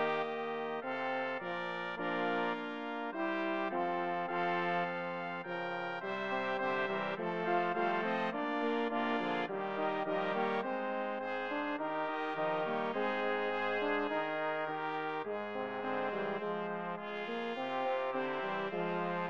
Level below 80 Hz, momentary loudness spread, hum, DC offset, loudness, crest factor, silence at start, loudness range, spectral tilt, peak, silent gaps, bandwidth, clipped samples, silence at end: -82 dBFS; 5 LU; none; under 0.1%; -36 LUFS; 16 dB; 0 s; 3 LU; -6.5 dB/octave; -20 dBFS; none; 8 kHz; under 0.1%; 0 s